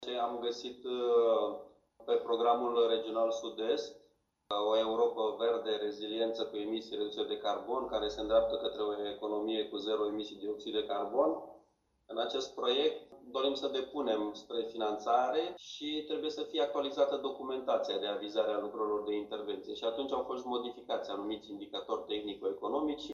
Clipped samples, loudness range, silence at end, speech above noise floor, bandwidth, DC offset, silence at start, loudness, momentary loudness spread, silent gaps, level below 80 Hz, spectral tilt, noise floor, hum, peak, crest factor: under 0.1%; 4 LU; 0 s; 38 dB; 7.4 kHz; under 0.1%; 0 s; -35 LUFS; 9 LU; none; -68 dBFS; -4 dB/octave; -72 dBFS; none; -16 dBFS; 18 dB